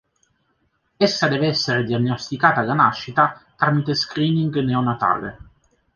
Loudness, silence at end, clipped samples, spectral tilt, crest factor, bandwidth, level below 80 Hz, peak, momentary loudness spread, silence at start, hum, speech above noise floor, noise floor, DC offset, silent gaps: -20 LUFS; 0.6 s; under 0.1%; -5.5 dB/octave; 20 dB; 7.2 kHz; -54 dBFS; -2 dBFS; 5 LU; 1 s; none; 48 dB; -67 dBFS; under 0.1%; none